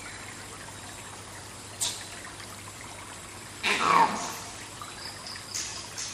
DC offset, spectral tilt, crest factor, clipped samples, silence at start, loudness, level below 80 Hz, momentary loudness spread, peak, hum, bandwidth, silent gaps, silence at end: under 0.1%; -1.5 dB/octave; 26 dB; under 0.1%; 0 s; -31 LUFS; -60 dBFS; 18 LU; -8 dBFS; none; 15 kHz; none; 0 s